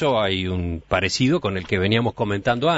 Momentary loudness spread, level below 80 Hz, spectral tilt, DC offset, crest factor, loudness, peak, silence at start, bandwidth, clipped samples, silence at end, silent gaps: 4 LU; -44 dBFS; -5.5 dB/octave; under 0.1%; 16 dB; -22 LUFS; -4 dBFS; 0 s; 8 kHz; under 0.1%; 0 s; none